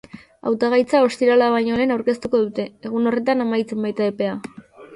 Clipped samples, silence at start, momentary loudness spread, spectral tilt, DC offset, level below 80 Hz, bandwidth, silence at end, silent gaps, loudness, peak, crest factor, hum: under 0.1%; 0.15 s; 10 LU; -6 dB/octave; under 0.1%; -58 dBFS; 11.5 kHz; 0 s; none; -20 LUFS; -4 dBFS; 16 dB; none